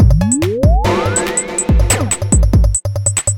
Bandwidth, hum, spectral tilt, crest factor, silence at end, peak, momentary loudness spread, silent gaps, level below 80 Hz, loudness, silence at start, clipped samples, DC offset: 17 kHz; none; -5 dB/octave; 12 dB; 0 s; 0 dBFS; 4 LU; none; -16 dBFS; -14 LUFS; 0 s; under 0.1%; under 0.1%